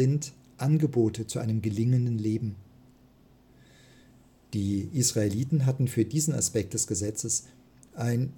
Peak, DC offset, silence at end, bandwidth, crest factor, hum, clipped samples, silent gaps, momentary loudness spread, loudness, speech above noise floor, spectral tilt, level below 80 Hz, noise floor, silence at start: -12 dBFS; under 0.1%; 0 s; 17 kHz; 18 dB; none; under 0.1%; none; 7 LU; -28 LUFS; 31 dB; -5.5 dB/octave; -60 dBFS; -58 dBFS; 0 s